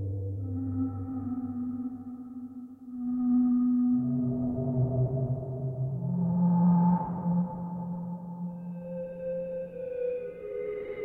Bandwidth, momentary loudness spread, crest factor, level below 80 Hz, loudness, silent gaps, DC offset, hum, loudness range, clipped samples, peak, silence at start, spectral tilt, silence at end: 2.8 kHz; 13 LU; 14 dB; -56 dBFS; -30 LUFS; none; under 0.1%; none; 8 LU; under 0.1%; -16 dBFS; 0 s; -13 dB/octave; 0 s